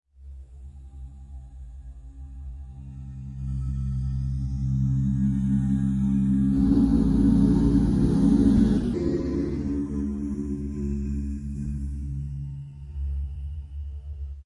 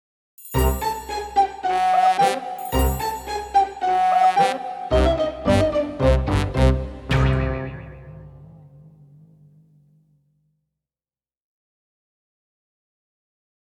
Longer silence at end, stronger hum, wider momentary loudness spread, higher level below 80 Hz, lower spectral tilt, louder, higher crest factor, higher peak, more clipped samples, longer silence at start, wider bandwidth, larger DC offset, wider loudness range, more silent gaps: second, 0 s vs 4.95 s; neither; first, 23 LU vs 11 LU; about the same, -32 dBFS vs -30 dBFS; first, -9.5 dB/octave vs -6 dB/octave; second, -25 LUFS vs -21 LUFS; about the same, 16 dB vs 18 dB; about the same, -8 dBFS vs -6 dBFS; neither; second, 0.2 s vs 0.4 s; second, 11 kHz vs 19 kHz; neither; first, 14 LU vs 8 LU; neither